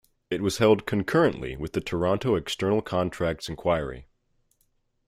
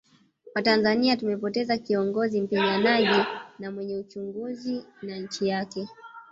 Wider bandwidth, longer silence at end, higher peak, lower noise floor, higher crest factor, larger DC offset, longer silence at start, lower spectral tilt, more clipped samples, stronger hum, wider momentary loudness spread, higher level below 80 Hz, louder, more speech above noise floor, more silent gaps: first, 15.5 kHz vs 7.8 kHz; first, 1.05 s vs 0.1 s; about the same, -8 dBFS vs -8 dBFS; first, -70 dBFS vs -54 dBFS; about the same, 18 dB vs 18 dB; neither; second, 0.3 s vs 0.45 s; about the same, -6 dB/octave vs -5.5 dB/octave; neither; neither; second, 10 LU vs 15 LU; first, -50 dBFS vs -68 dBFS; about the same, -26 LUFS vs -26 LUFS; first, 45 dB vs 28 dB; neither